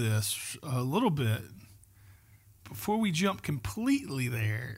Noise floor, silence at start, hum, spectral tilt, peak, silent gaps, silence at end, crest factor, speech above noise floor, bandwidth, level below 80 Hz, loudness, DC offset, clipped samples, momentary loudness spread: -59 dBFS; 0 s; none; -5 dB/octave; -16 dBFS; none; 0 s; 16 dB; 28 dB; 16 kHz; -58 dBFS; -31 LUFS; under 0.1%; under 0.1%; 7 LU